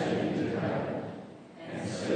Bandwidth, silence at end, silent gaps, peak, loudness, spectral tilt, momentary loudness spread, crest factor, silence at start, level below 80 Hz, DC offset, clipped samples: 9.6 kHz; 0 s; none; -16 dBFS; -33 LUFS; -6.5 dB/octave; 16 LU; 16 dB; 0 s; -66 dBFS; under 0.1%; under 0.1%